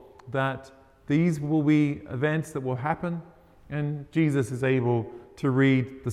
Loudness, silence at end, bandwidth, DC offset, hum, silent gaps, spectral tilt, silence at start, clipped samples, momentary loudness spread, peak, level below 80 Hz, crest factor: -26 LUFS; 0 s; 12.5 kHz; under 0.1%; none; none; -8 dB/octave; 0.25 s; under 0.1%; 10 LU; -10 dBFS; -60 dBFS; 16 dB